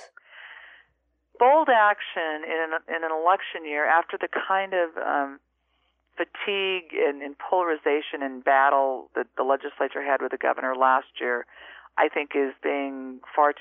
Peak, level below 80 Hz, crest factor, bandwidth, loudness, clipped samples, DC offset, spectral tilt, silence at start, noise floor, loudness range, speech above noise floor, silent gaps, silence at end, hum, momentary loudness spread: -6 dBFS; -76 dBFS; 18 dB; 4.7 kHz; -25 LUFS; under 0.1%; under 0.1%; 0.5 dB/octave; 0 s; -71 dBFS; 4 LU; 47 dB; none; 0 s; none; 13 LU